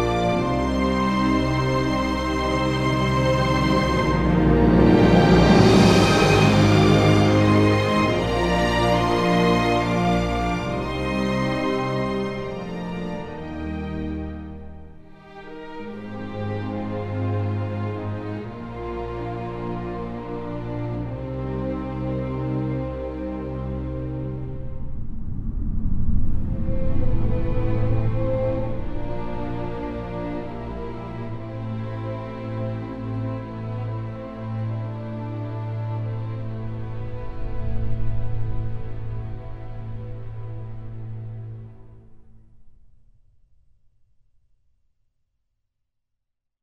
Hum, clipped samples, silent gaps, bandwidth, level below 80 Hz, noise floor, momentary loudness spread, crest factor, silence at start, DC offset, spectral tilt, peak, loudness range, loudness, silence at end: none; under 0.1%; none; 12 kHz; -32 dBFS; -78 dBFS; 18 LU; 20 dB; 0 s; under 0.1%; -6.5 dB/octave; -2 dBFS; 16 LU; -23 LUFS; 3.75 s